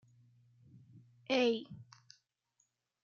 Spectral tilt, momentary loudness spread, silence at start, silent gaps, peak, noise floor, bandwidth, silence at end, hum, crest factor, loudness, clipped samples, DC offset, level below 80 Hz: -2.5 dB/octave; 24 LU; 1.3 s; none; -20 dBFS; -80 dBFS; 7.2 kHz; 1.2 s; none; 20 dB; -34 LUFS; under 0.1%; under 0.1%; -86 dBFS